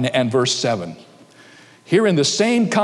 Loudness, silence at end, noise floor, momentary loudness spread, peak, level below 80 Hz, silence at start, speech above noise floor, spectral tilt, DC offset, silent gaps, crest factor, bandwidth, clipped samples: -18 LUFS; 0 s; -46 dBFS; 7 LU; -4 dBFS; -66 dBFS; 0 s; 29 dB; -4.5 dB/octave; under 0.1%; none; 16 dB; 12 kHz; under 0.1%